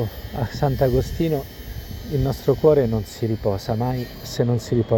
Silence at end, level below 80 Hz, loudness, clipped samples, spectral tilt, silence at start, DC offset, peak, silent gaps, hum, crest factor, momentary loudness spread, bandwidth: 0 s; -36 dBFS; -22 LUFS; under 0.1%; -7.5 dB/octave; 0 s; under 0.1%; -2 dBFS; none; none; 18 dB; 12 LU; 17 kHz